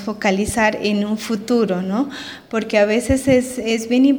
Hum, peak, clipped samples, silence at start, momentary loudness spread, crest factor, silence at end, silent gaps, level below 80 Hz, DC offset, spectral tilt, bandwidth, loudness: none; -2 dBFS; under 0.1%; 0 s; 8 LU; 16 dB; 0 s; none; -40 dBFS; under 0.1%; -5 dB/octave; over 20 kHz; -18 LUFS